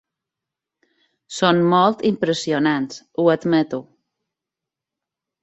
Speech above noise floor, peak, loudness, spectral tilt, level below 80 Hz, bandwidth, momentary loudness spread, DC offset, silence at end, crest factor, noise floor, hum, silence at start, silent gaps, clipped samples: 68 dB; -2 dBFS; -19 LUFS; -5.5 dB/octave; -64 dBFS; 8.2 kHz; 11 LU; under 0.1%; 1.6 s; 18 dB; -86 dBFS; none; 1.3 s; none; under 0.1%